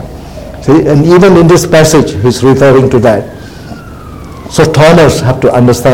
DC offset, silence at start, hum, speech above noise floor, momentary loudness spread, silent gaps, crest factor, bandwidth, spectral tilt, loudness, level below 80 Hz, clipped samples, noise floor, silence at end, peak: under 0.1%; 0 s; none; 20 dB; 22 LU; none; 6 dB; 17 kHz; -6 dB/octave; -6 LUFS; -28 dBFS; 4%; -25 dBFS; 0 s; 0 dBFS